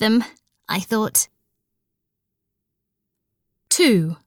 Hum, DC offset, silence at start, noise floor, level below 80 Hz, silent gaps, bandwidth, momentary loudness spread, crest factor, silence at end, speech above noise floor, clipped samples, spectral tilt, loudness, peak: none; under 0.1%; 0 s; -80 dBFS; -68 dBFS; none; 20 kHz; 11 LU; 18 dB; 0.1 s; 61 dB; under 0.1%; -3.5 dB/octave; -19 LUFS; -4 dBFS